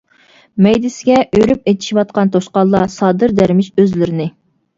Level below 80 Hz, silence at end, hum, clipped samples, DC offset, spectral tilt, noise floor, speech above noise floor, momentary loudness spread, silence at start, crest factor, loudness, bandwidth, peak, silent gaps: -44 dBFS; 0.5 s; none; under 0.1%; under 0.1%; -7 dB/octave; -49 dBFS; 36 dB; 5 LU; 0.55 s; 14 dB; -13 LUFS; 7.6 kHz; 0 dBFS; none